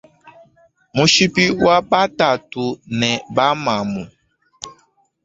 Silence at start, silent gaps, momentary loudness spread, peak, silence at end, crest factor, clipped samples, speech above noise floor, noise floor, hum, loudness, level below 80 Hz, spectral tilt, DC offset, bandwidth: 0.25 s; none; 22 LU; -2 dBFS; 0.55 s; 18 dB; under 0.1%; 42 dB; -59 dBFS; none; -16 LUFS; -52 dBFS; -4 dB/octave; under 0.1%; 8 kHz